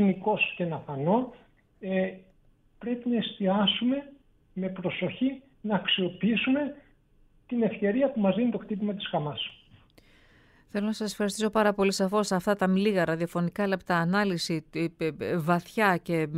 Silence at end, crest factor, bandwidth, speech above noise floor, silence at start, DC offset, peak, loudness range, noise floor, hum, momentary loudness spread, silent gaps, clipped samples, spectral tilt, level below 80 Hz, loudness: 0 s; 18 dB; 15.5 kHz; 34 dB; 0 s; under 0.1%; -10 dBFS; 4 LU; -62 dBFS; none; 9 LU; none; under 0.1%; -5.5 dB/octave; -62 dBFS; -28 LUFS